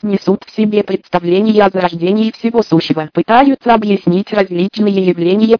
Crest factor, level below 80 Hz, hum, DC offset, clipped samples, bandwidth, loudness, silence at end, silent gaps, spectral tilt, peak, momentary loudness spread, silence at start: 12 dB; -48 dBFS; none; under 0.1%; under 0.1%; 5.4 kHz; -13 LUFS; 0 s; none; -8 dB/octave; 0 dBFS; 6 LU; 0 s